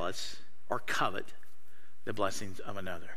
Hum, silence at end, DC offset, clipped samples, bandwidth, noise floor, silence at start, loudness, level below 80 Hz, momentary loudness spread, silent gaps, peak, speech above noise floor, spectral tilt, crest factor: none; 0 s; 3%; under 0.1%; 16 kHz; -65 dBFS; 0 s; -37 LUFS; -66 dBFS; 12 LU; none; -14 dBFS; 28 dB; -3.5 dB/octave; 22 dB